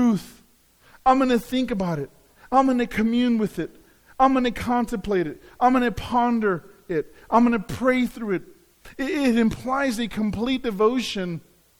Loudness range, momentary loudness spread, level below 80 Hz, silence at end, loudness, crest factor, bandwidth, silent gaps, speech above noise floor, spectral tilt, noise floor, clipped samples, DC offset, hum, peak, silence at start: 2 LU; 10 LU; -46 dBFS; 0.4 s; -23 LUFS; 18 dB; 17 kHz; none; 35 dB; -6 dB/octave; -57 dBFS; under 0.1%; under 0.1%; none; -6 dBFS; 0 s